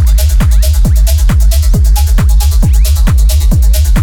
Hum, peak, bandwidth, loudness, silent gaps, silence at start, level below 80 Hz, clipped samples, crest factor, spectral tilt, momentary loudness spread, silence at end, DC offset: none; 0 dBFS; 19 kHz; -10 LUFS; none; 0 s; -6 dBFS; under 0.1%; 6 dB; -5.5 dB/octave; 0 LU; 0 s; under 0.1%